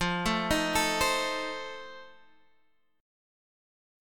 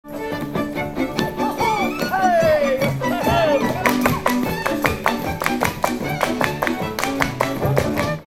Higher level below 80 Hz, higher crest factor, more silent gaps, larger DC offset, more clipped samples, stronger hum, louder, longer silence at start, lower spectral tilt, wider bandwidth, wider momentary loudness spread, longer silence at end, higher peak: second, -48 dBFS vs -40 dBFS; about the same, 20 dB vs 20 dB; neither; neither; neither; neither; second, -28 LUFS vs -20 LUFS; about the same, 0 s vs 0.05 s; second, -3 dB/octave vs -5 dB/octave; about the same, 17.5 kHz vs 18 kHz; first, 18 LU vs 6 LU; first, 1 s vs 0.05 s; second, -12 dBFS vs 0 dBFS